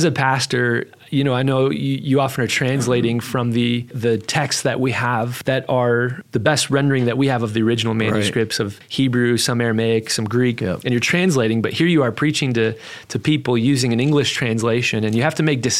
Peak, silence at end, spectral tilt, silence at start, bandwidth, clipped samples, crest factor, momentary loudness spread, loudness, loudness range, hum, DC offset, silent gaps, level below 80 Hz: 0 dBFS; 0 s; -5 dB/octave; 0 s; 16 kHz; under 0.1%; 18 dB; 4 LU; -19 LUFS; 1 LU; none; under 0.1%; none; -56 dBFS